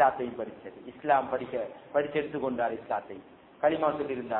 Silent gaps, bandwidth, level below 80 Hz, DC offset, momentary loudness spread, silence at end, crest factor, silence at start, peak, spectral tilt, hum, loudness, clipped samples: none; 4.1 kHz; -66 dBFS; under 0.1%; 14 LU; 0 s; 20 dB; 0 s; -10 dBFS; -9.5 dB/octave; none; -30 LUFS; under 0.1%